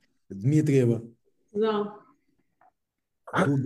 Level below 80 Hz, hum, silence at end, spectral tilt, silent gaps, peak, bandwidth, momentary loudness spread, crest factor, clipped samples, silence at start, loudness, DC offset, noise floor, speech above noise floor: -72 dBFS; none; 0 s; -7.5 dB/octave; none; -10 dBFS; 12.5 kHz; 14 LU; 18 dB; under 0.1%; 0.3 s; -26 LUFS; under 0.1%; -83 dBFS; 59 dB